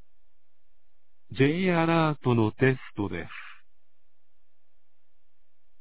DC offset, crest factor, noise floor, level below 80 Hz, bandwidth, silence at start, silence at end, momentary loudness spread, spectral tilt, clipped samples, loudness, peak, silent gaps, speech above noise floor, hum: 0.8%; 20 dB; -77 dBFS; -58 dBFS; 4 kHz; 1.3 s; 2.3 s; 17 LU; -11 dB/octave; under 0.1%; -25 LUFS; -8 dBFS; none; 51 dB; none